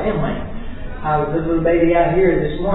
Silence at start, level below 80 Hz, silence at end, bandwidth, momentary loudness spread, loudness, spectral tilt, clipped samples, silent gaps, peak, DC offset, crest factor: 0 s; -28 dBFS; 0 s; 4.1 kHz; 16 LU; -18 LUFS; -11.5 dB/octave; under 0.1%; none; -4 dBFS; under 0.1%; 14 dB